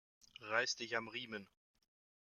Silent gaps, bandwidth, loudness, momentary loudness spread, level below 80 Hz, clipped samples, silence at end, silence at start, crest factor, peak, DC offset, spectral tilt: none; 14 kHz; -41 LUFS; 16 LU; -86 dBFS; under 0.1%; 0.8 s; 0.4 s; 24 dB; -20 dBFS; under 0.1%; -1.5 dB/octave